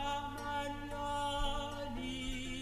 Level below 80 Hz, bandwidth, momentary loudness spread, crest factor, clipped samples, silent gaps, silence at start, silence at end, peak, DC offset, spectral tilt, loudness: -46 dBFS; 14 kHz; 5 LU; 14 dB; under 0.1%; none; 0 s; 0 s; -24 dBFS; under 0.1%; -4 dB/octave; -40 LUFS